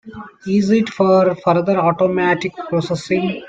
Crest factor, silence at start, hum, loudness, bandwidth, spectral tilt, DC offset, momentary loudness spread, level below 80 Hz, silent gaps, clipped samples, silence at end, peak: 14 dB; 0.05 s; none; -16 LUFS; 8.8 kHz; -7 dB/octave; under 0.1%; 7 LU; -56 dBFS; none; under 0.1%; 0 s; -2 dBFS